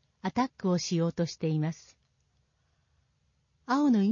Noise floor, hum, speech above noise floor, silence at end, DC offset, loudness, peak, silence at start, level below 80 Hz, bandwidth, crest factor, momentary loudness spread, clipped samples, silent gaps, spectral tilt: -73 dBFS; none; 45 dB; 0 s; under 0.1%; -30 LUFS; -16 dBFS; 0.25 s; -68 dBFS; 7.4 kHz; 14 dB; 8 LU; under 0.1%; none; -6.5 dB/octave